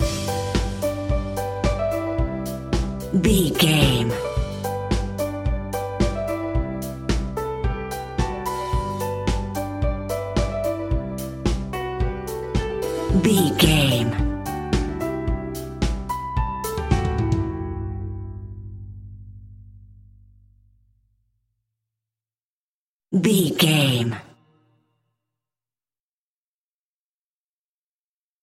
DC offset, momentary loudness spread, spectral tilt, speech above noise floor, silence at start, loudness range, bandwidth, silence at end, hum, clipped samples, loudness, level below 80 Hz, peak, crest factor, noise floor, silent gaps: under 0.1%; 12 LU; -5.5 dB/octave; over 72 dB; 0 s; 7 LU; 17 kHz; 4.15 s; none; under 0.1%; -23 LUFS; -32 dBFS; -2 dBFS; 22 dB; under -90 dBFS; 22.45-23.00 s